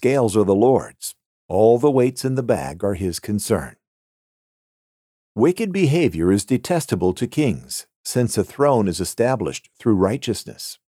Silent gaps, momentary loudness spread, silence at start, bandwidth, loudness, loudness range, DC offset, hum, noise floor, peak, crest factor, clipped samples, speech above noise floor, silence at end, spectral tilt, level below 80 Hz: 1.26-1.49 s, 3.87-5.35 s, 7.96-8.04 s; 12 LU; 0 s; 16 kHz; -20 LUFS; 5 LU; under 0.1%; none; under -90 dBFS; -4 dBFS; 16 dB; under 0.1%; over 71 dB; 0.15 s; -6 dB/octave; -50 dBFS